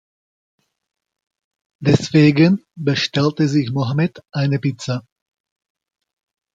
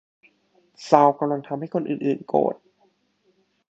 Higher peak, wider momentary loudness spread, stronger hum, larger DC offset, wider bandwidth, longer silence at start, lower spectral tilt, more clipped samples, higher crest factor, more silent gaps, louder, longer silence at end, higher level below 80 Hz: about the same, -2 dBFS vs 0 dBFS; about the same, 10 LU vs 11 LU; neither; neither; about the same, 7.8 kHz vs 8 kHz; first, 1.8 s vs 0.8 s; about the same, -6.5 dB/octave vs -7 dB/octave; neither; second, 18 dB vs 24 dB; neither; first, -18 LUFS vs -22 LUFS; first, 1.55 s vs 1.15 s; first, -58 dBFS vs -70 dBFS